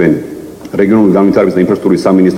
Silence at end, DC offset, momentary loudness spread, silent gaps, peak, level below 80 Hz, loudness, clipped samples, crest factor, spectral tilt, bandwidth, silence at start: 0 s; under 0.1%; 13 LU; none; 0 dBFS; -44 dBFS; -10 LUFS; 0.4%; 10 dB; -8 dB/octave; 15 kHz; 0 s